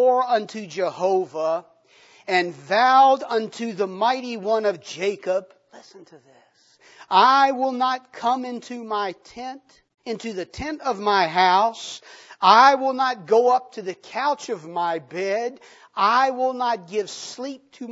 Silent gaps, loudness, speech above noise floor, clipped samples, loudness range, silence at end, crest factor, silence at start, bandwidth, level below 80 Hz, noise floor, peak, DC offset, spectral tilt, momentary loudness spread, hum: none; -21 LUFS; 34 dB; under 0.1%; 7 LU; 0 s; 20 dB; 0 s; 8 kHz; -62 dBFS; -55 dBFS; -2 dBFS; under 0.1%; -3.5 dB/octave; 18 LU; none